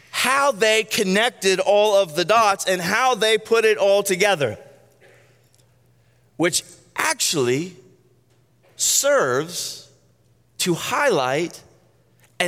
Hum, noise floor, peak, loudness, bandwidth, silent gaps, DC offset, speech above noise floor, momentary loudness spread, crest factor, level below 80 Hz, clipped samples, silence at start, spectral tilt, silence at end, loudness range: none; -59 dBFS; -4 dBFS; -19 LUFS; 16.5 kHz; none; under 0.1%; 40 dB; 9 LU; 18 dB; -70 dBFS; under 0.1%; 0.15 s; -2.5 dB/octave; 0 s; 7 LU